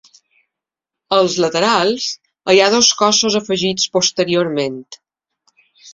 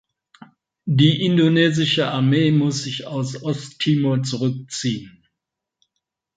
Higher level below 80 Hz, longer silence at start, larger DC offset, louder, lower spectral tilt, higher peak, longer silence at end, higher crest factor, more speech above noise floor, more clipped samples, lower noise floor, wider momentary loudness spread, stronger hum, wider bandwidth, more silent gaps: about the same, -58 dBFS vs -60 dBFS; first, 1.1 s vs 0.85 s; neither; first, -15 LUFS vs -19 LUFS; second, -2.5 dB/octave vs -5.5 dB/octave; about the same, 0 dBFS vs -2 dBFS; second, 0 s vs 1.3 s; about the same, 18 dB vs 18 dB; first, 69 dB vs 64 dB; neither; about the same, -84 dBFS vs -83 dBFS; about the same, 11 LU vs 11 LU; neither; second, 7.8 kHz vs 9.2 kHz; neither